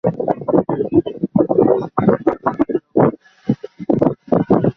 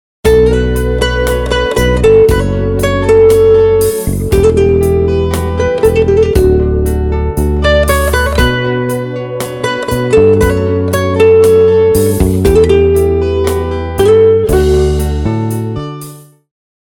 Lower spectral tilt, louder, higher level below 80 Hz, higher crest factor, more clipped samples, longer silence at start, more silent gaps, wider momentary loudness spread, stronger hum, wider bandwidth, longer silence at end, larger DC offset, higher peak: first, -11 dB/octave vs -6 dB/octave; second, -17 LUFS vs -10 LUFS; second, -48 dBFS vs -20 dBFS; first, 16 dB vs 10 dB; neither; second, 0.05 s vs 0.25 s; neither; about the same, 8 LU vs 9 LU; neither; second, 6 kHz vs 18.5 kHz; second, 0.05 s vs 0.65 s; neither; about the same, 0 dBFS vs 0 dBFS